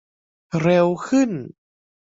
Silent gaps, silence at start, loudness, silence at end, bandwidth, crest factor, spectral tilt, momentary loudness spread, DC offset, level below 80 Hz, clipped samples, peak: none; 0.55 s; -20 LUFS; 0.65 s; 7.8 kHz; 18 dB; -7 dB/octave; 14 LU; under 0.1%; -60 dBFS; under 0.1%; -4 dBFS